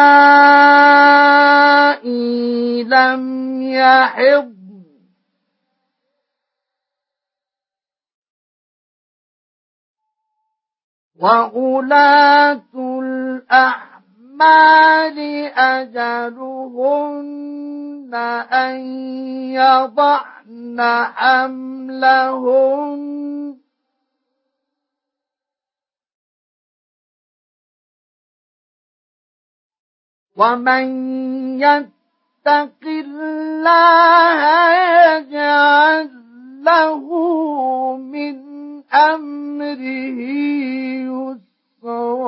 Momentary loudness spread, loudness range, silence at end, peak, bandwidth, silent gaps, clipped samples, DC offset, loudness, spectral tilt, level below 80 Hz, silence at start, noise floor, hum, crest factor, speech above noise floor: 18 LU; 10 LU; 0 s; 0 dBFS; 5.8 kHz; 8.14-8.22 s, 8.30-9.95 s, 10.84-11.11 s, 26.14-29.70 s, 29.79-30.26 s; under 0.1%; under 0.1%; -13 LUFS; -7 dB/octave; -78 dBFS; 0 s; under -90 dBFS; none; 16 dB; over 76 dB